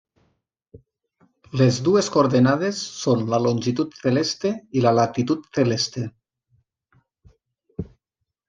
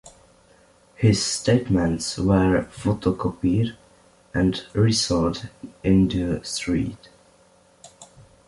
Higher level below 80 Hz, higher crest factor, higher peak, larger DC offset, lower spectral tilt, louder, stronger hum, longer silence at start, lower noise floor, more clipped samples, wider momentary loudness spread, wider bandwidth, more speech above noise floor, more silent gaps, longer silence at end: second, -58 dBFS vs -42 dBFS; about the same, 20 dB vs 18 dB; about the same, -4 dBFS vs -4 dBFS; neither; about the same, -5.5 dB/octave vs -5.5 dB/octave; about the same, -21 LUFS vs -22 LUFS; neither; first, 0.75 s vs 0.05 s; first, -82 dBFS vs -56 dBFS; neither; first, 15 LU vs 8 LU; second, 9.4 kHz vs 11.5 kHz; first, 61 dB vs 35 dB; neither; first, 0.65 s vs 0.45 s